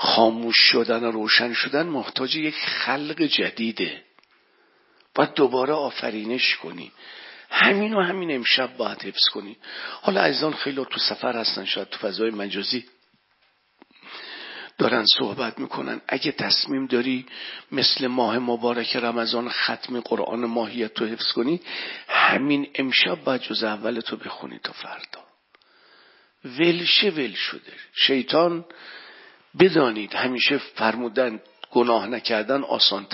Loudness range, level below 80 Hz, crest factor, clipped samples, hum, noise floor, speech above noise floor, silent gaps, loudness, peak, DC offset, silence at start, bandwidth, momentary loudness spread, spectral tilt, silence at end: 4 LU; -74 dBFS; 24 dB; under 0.1%; none; -65 dBFS; 42 dB; none; -22 LUFS; 0 dBFS; under 0.1%; 0 s; 5.8 kHz; 17 LU; -7 dB/octave; 0 s